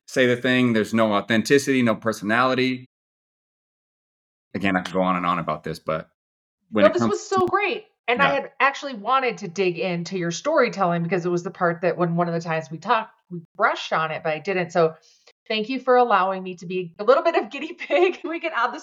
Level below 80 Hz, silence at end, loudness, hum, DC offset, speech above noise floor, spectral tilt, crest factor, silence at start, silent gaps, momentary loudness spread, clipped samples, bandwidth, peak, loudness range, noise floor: -66 dBFS; 0 s; -22 LUFS; none; under 0.1%; over 68 dB; -5.5 dB/octave; 20 dB; 0.1 s; 2.86-4.51 s, 6.14-6.58 s, 7.99-8.04 s, 13.45-13.55 s, 15.32-15.46 s; 10 LU; under 0.1%; 14.5 kHz; -4 dBFS; 4 LU; under -90 dBFS